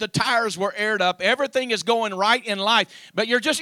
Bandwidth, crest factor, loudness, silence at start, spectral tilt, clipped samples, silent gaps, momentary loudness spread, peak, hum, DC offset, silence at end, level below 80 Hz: 16 kHz; 18 dB; -21 LUFS; 0 s; -3 dB/octave; under 0.1%; none; 4 LU; -4 dBFS; none; under 0.1%; 0 s; -64 dBFS